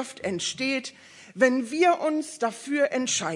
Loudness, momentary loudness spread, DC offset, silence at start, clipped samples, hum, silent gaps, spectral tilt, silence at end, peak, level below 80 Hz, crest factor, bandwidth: -25 LUFS; 9 LU; under 0.1%; 0 s; under 0.1%; none; none; -3 dB/octave; 0 s; -6 dBFS; -78 dBFS; 20 dB; 11.5 kHz